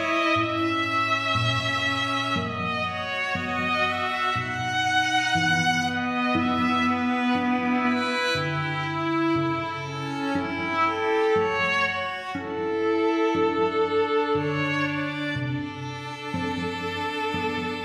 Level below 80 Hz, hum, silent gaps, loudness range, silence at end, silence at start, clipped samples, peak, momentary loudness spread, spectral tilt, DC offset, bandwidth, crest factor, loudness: -60 dBFS; none; none; 3 LU; 0 s; 0 s; under 0.1%; -12 dBFS; 7 LU; -5 dB/octave; under 0.1%; 14 kHz; 14 dB; -24 LUFS